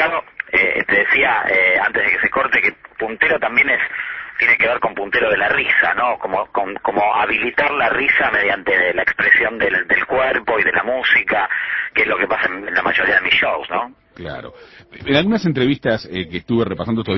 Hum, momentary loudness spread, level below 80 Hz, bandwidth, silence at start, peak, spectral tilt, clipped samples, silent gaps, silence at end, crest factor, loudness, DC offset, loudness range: none; 9 LU; -48 dBFS; 6 kHz; 0 s; 0 dBFS; -6.5 dB/octave; under 0.1%; none; 0 s; 18 dB; -16 LUFS; under 0.1%; 3 LU